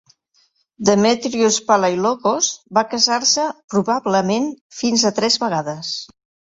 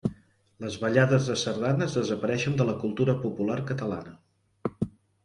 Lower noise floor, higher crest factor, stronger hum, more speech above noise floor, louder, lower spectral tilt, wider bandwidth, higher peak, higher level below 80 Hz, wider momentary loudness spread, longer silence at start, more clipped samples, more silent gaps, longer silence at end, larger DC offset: first, -62 dBFS vs -54 dBFS; about the same, 18 dB vs 22 dB; neither; first, 44 dB vs 28 dB; first, -18 LUFS vs -28 LUFS; second, -3 dB/octave vs -6 dB/octave; second, 8 kHz vs 11 kHz; first, -2 dBFS vs -6 dBFS; about the same, -62 dBFS vs -58 dBFS; second, 9 LU vs 13 LU; first, 0.8 s vs 0.05 s; neither; first, 3.64-3.68 s, 4.61-4.70 s vs none; about the same, 0.45 s vs 0.35 s; neither